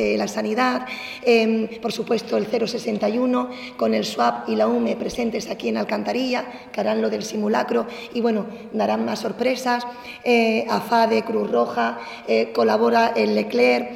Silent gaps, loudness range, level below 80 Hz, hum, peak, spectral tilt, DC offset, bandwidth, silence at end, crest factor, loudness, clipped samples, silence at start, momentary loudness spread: none; 4 LU; -60 dBFS; none; -6 dBFS; -5 dB/octave; under 0.1%; 15 kHz; 0 s; 16 dB; -22 LUFS; under 0.1%; 0 s; 8 LU